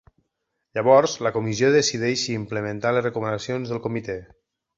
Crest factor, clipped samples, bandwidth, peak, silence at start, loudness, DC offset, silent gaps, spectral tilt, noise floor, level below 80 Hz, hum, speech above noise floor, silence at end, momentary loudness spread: 20 dB; under 0.1%; 8 kHz; -4 dBFS; 0.75 s; -22 LUFS; under 0.1%; none; -4.5 dB/octave; -78 dBFS; -58 dBFS; none; 56 dB; 0.55 s; 12 LU